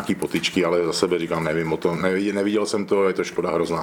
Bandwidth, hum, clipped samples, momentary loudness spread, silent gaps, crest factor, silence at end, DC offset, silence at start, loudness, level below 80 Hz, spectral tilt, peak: 18 kHz; none; under 0.1%; 3 LU; none; 18 dB; 0 s; under 0.1%; 0 s; -22 LUFS; -56 dBFS; -5 dB/octave; -4 dBFS